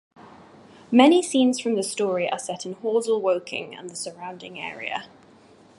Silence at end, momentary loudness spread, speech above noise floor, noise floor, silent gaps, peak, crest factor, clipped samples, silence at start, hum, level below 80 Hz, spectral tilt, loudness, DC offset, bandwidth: 0.75 s; 17 LU; 29 dB; -52 dBFS; none; -2 dBFS; 22 dB; under 0.1%; 0.2 s; none; -74 dBFS; -3.5 dB/octave; -23 LUFS; under 0.1%; 11.5 kHz